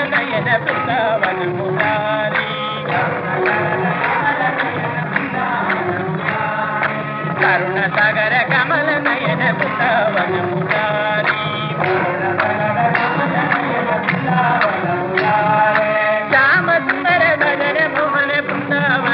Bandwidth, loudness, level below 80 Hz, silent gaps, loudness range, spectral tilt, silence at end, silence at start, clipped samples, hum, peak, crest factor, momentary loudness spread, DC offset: 5.8 kHz; -16 LUFS; -60 dBFS; none; 4 LU; -9 dB/octave; 0 s; 0 s; under 0.1%; none; 0 dBFS; 16 dB; 6 LU; under 0.1%